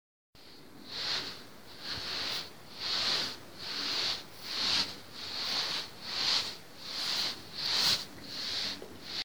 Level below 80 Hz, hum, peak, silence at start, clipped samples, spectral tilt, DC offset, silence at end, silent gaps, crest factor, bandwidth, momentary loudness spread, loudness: -68 dBFS; none; -14 dBFS; 0.3 s; under 0.1%; -0.5 dB/octave; 0.3%; 0 s; none; 20 dB; over 20 kHz; 14 LU; -32 LUFS